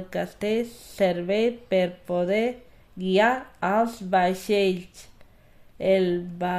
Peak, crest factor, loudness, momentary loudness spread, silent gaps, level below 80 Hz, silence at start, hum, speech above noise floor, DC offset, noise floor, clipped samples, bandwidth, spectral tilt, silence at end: -8 dBFS; 18 dB; -25 LUFS; 8 LU; none; -56 dBFS; 0 s; none; 28 dB; under 0.1%; -52 dBFS; under 0.1%; 15.5 kHz; -6 dB/octave; 0 s